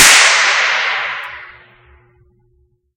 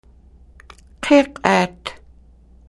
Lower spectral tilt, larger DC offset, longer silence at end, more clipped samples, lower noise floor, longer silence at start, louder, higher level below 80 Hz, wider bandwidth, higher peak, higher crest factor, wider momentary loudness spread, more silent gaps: second, 2 dB/octave vs -5 dB/octave; neither; first, 1.5 s vs 0.75 s; first, 0.4% vs under 0.1%; first, -58 dBFS vs -48 dBFS; second, 0 s vs 1 s; first, -10 LUFS vs -17 LUFS; about the same, -48 dBFS vs -48 dBFS; first, over 20 kHz vs 12 kHz; about the same, 0 dBFS vs 0 dBFS; second, 14 dB vs 20 dB; first, 21 LU vs 18 LU; neither